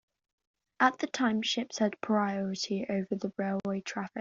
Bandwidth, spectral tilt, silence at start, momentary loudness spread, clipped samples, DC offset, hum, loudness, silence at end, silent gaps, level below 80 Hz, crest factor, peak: 7.6 kHz; -3.5 dB/octave; 0.8 s; 7 LU; under 0.1%; under 0.1%; none; -31 LUFS; 0 s; none; -74 dBFS; 22 dB; -10 dBFS